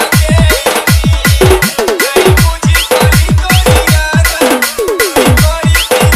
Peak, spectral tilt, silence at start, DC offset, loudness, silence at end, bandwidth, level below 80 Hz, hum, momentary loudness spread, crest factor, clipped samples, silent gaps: 0 dBFS; -4.5 dB/octave; 0 s; under 0.1%; -8 LUFS; 0 s; 16.5 kHz; -16 dBFS; none; 3 LU; 8 dB; 0.3%; none